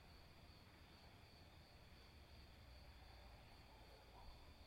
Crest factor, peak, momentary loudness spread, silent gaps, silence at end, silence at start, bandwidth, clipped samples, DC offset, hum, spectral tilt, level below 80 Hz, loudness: 16 dB; -48 dBFS; 2 LU; none; 0 s; 0 s; 16 kHz; under 0.1%; under 0.1%; none; -4.5 dB/octave; -68 dBFS; -65 LUFS